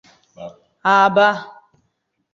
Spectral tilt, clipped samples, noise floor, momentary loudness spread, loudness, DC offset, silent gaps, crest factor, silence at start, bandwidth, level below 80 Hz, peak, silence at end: -5 dB/octave; under 0.1%; -70 dBFS; 25 LU; -15 LUFS; under 0.1%; none; 18 dB; 0.4 s; 7.6 kHz; -66 dBFS; -2 dBFS; 0.85 s